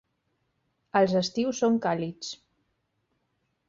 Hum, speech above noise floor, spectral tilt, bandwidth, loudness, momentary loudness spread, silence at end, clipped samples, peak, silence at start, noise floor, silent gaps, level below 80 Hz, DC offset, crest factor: none; 50 dB; -5 dB/octave; 7.6 kHz; -26 LUFS; 15 LU; 1.35 s; under 0.1%; -10 dBFS; 0.95 s; -76 dBFS; none; -68 dBFS; under 0.1%; 20 dB